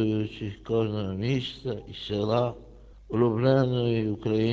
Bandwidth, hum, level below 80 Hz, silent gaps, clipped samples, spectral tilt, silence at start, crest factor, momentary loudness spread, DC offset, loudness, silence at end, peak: 7.6 kHz; none; -50 dBFS; none; under 0.1%; -8 dB/octave; 0 s; 16 dB; 12 LU; under 0.1%; -27 LUFS; 0 s; -10 dBFS